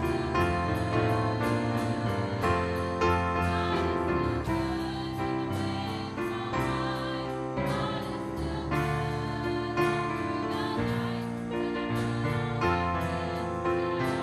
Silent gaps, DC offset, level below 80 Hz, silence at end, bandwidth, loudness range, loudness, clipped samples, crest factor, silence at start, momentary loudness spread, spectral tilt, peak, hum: none; under 0.1%; -46 dBFS; 0 s; 15 kHz; 3 LU; -30 LUFS; under 0.1%; 16 dB; 0 s; 6 LU; -6.5 dB/octave; -14 dBFS; none